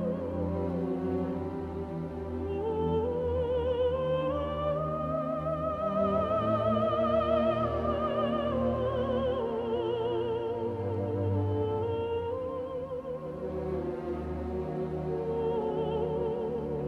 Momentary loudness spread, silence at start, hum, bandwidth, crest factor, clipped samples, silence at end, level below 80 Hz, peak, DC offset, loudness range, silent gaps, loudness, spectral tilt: 8 LU; 0 s; none; 6.6 kHz; 14 dB; under 0.1%; 0 s; -48 dBFS; -16 dBFS; under 0.1%; 5 LU; none; -31 LUFS; -9 dB/octave